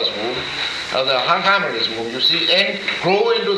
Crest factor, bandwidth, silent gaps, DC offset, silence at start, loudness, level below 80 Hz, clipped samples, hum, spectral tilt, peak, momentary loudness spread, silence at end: 16 dB; 13 kHz; none; under 0.1%; 0 s; -17 LUFS; -56 dBFS; under 0.1%; none; -3.5 dB/octave; -2 dBFS; 7 LU; 0 s